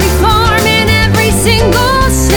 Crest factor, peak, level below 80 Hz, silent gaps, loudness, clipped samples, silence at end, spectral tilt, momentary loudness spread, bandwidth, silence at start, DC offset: 8 dB; 0 dBFS; -18 dBFS; none; -9 LUFS; under 0.1%; 0 s; -4 dB/octave; 1 LU; over 20 kHz; 0 s; under 0.1%